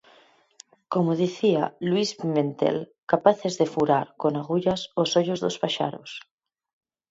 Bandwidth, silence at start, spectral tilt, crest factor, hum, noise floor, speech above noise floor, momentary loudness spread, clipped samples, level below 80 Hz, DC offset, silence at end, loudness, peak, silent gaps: 8 kHz; 0.9 s; -5.5 dB/octave; 22 dB; none; -58 dBFS; 34 dB; 7 LU; under 0.1%; -66 dBFS; under 0.1%; 0.9 s; -25 LUFS; -4 dBFS; 2.98-3.03 s